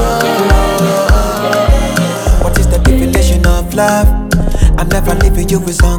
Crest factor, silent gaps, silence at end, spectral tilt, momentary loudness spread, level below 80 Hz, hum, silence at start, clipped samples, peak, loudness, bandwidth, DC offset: 10 dB; none; 0 s; -5.5 dB/octave; 3 LU; -12 dBFS; none; 0 s; 0.8%; 0 dBFS; -12 LUFS; 19.5 kHz; under 0.1%